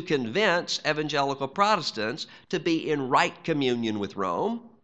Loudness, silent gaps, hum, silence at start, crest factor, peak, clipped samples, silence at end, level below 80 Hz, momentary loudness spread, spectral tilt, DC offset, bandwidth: -26 LUFS; none; none; 0 s; 20 dB; -6 dBFS; under 0.1%; 0.15 s; -70 dBFS; 7 LU; -4.5 dB/octave; 0.1%; 9 kHz